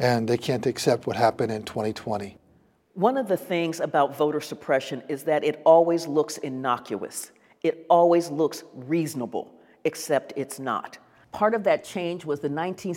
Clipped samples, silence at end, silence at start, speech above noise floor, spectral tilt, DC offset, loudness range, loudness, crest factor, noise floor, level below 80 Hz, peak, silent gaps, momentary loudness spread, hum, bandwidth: under 0.1%; 0 s; 0 s; 37 dB; -5.5 dB/octave; under 0.1%; 5 LU; -25 LUFS; 20 dB; -61 dBFS; -68 dBFS; -4 dBFS; none; 13 LU; none; 17 kHz